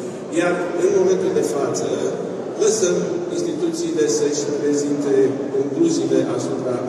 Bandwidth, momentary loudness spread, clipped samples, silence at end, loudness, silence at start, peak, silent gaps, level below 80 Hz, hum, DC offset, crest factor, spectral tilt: 13 kHz; 6 LU; under 0.1%; 0 s; -20 LUFS; 0 s; -6 dBFS; none; -68 dBFS; none; under 0.1%; 14 dB; -5 dB/octave